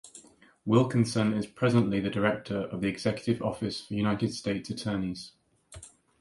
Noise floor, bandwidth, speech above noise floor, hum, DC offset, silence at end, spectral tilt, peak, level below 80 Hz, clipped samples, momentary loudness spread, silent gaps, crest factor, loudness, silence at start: -56 dBFS; 11.5 kHz; 28 dB; none; under 0.1%; 0.3 s; -6.5 dB/octave; -8 dBFS; -58 dBFS; under 0.1%; 16 LU; none; 20 dB; -29 LUFS; 0.05 s